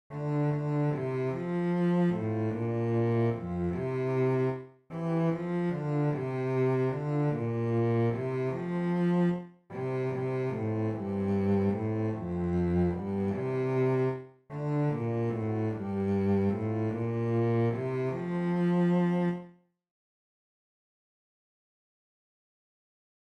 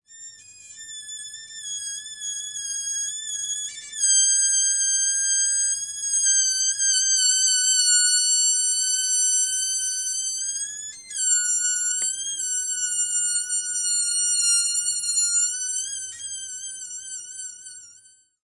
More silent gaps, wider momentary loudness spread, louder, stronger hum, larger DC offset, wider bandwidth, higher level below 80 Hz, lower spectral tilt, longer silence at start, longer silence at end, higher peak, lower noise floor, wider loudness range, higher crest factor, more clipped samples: neither; second, 5 LU vs 17 LU; second, -30 LUFS vs -20 LUFS; neither; neither; second, 6.4 kHz vs 11.5 kHz; first, -60 dBFS vs -76 dBFS; first, -10 dB/octave vs 5.5 dB/octave; about the same, 0.1 s vs 0.1 s; first, 3.75 s vs 0.5 s; second, -18 dBFS vs -8 dBFS; about the same, -54 dBFS vs -54 dBFS; second, 2 LU vs 8 LU; about the same, 12 dB vs 16 dB; neither